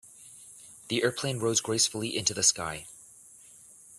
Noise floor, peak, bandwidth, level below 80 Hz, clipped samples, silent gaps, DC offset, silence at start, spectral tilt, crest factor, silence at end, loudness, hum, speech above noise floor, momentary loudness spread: -53 dBFS; -8 dBFS; 15 kHz; -66 dBFS; under 0.1%; none; under 0.1%; 0.05 s; -2 dB/octave; 24 dB; 0 s; -27 LUFS; none; 25 dB; 23 LU